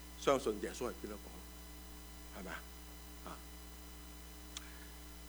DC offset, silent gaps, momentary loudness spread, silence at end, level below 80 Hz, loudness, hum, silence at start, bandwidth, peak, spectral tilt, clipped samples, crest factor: under 0.1%; none; 16 LU; 0 s; -54 dBFS; -44 LUFS; none; 0 s; over 20 kHz; -18 dBFS; -4 dB/octave; under 0.1%; 26 dB